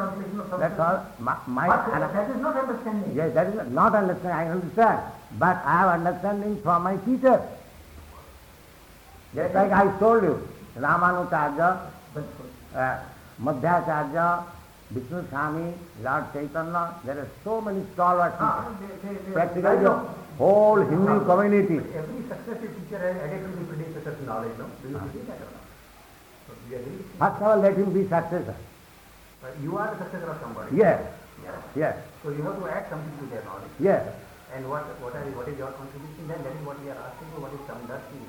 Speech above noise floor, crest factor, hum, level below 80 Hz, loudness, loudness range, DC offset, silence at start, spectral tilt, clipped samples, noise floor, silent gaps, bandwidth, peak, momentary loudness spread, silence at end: 26 dB; 18 dB; none; -54 dBFS; -25 LUFS; 11 LU; under 0.1%; 0 s; -8 dB/octave; under 0.1%; -51 dBFS; none; 19.5 kHz; -8 dBFS; 18 LU; 0 s